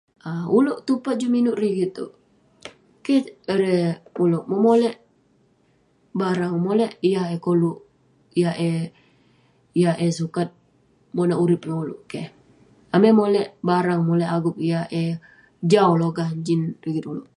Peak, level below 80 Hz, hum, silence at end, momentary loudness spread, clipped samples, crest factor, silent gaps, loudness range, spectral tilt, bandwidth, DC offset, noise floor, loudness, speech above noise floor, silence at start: -4 dBFS; -66 dBFS; none; 0.15 s; 14 LU; under 0.1%; 18 dB; none; 3 LU; -7.5 dB/octave; 11 kHz; under 0.1%; -62 dBFS; -22 LUFS; 41 dB; 0.25 s